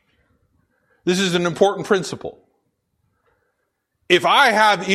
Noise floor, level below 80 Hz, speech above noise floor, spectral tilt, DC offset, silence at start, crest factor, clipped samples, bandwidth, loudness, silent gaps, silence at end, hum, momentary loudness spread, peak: -73 dBFS; -62 dBFS; 56 dB; -4 dB/octave; under 0.1%; 1.05 s; 20 dB; under 0.1%; 14 kHz; -17 LUFS; none; 0 s; none; 16 LU; -2 dBFS